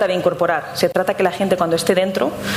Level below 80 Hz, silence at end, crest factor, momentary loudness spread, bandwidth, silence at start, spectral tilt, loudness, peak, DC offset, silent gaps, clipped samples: -52 dBFS; 0 s; 16 dB; 3 LU; 16 kHz; 0 s; -4.5 dB/octave; -18 LUFS; -2 dBFS; under 0.1%; none; under 0.1%